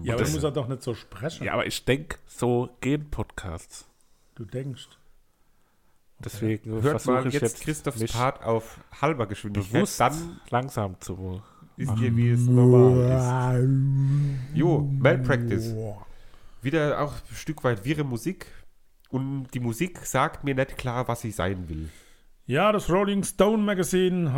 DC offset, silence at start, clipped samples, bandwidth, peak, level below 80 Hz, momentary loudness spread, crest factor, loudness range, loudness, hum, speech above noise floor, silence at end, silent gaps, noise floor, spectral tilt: under 0.1%; 0 s; under 0.1%; 16.5 kHz; -4 dBFS; -46 dBFS; 15 LU; 20 dB; 10 LU; -25 LUFS; none; 37 dB; 0 s; none; -61 dBFS; -6.5 dB/octave